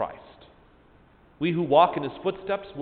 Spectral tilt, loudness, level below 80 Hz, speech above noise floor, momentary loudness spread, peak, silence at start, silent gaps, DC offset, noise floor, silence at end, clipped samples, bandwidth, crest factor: -10.5 dB/octave; -25 LUFS; -60 dBFS; 32 dB; 11 LU; -6 dBFS; 0 s; none; under 0.1%; -56 dBFS; 0 s; under 0.1%; 4.6 kHz; 20 dB